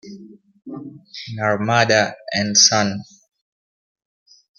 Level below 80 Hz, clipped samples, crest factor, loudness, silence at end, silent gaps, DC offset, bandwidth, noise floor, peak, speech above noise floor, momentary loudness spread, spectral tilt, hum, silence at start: -62 dBFS; under 0.1%; 22 dB; -16 LUFS; 1.55 s; none; under 0.1%; 11 kHz; -42 dBFS; 0 dBFS; 23 dB; 23 LU; -2.5 dB/octave; none; 0.05 s